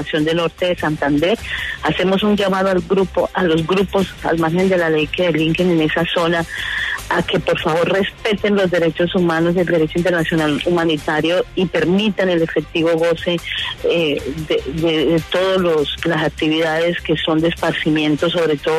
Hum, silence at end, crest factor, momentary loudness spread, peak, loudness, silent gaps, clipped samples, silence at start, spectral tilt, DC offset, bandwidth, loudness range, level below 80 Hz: none; 0 s; 12 dB; 4 LU; -4 dBFS; -17 LUFS; none; under 0.1%; 0 s; -6 dB/octave; under 0.1%; 13.5 kHz; 1 LU; -40 dBFS